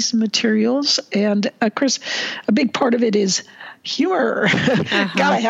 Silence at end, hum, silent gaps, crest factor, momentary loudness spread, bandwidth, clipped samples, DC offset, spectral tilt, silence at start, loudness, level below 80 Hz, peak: 0 s; none; none; 16 dB; 5 LU; 8 kHz; under 0.1%; under 0.1%; -4 dB/octave; 0 s; -18 LUFS; -62 dBFS; -2 dBFS